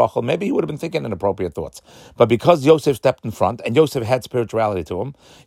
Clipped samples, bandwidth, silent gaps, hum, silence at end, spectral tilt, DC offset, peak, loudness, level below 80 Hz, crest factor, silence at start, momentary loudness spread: under 0.1%; 16 kHz; none; none; 0.35 s; -6.5 dB/octave; under 0.1%; 0 dBFS; -19 LUFS; -52 dBFS; 18 dB; 0 s; 12 LU